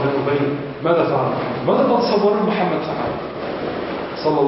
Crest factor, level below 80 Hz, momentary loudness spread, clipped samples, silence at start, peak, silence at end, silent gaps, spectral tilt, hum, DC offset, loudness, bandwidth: 14 dB; -50 dBFS; 9 LU; under 0.1%; 0 s; -4 dBFS; 0 s; none; -10 dB/octave; none; under 0.1%; -20 LUFS; 5.8 kHz